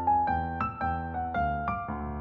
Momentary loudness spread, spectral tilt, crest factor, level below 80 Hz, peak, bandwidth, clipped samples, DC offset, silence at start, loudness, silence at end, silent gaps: 6 LU; -6.5 dB/octave; 14 dB; -42 dBFS; -16 dBFS; 5.8 kHz; under 0.1%; under 0.1%; 0 s; -30 LUFS; 0 s; none